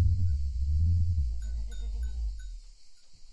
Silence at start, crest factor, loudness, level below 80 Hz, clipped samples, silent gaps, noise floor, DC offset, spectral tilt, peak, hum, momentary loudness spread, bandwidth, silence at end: 0 s; 14 dB; -32 LUFS; -34 dBFS; under 0.1%; none; -49 dBFS; under 0.1%; -7 dB/octave; -16 dBFS; none; 15 LU; 8 kHz; 0.05 s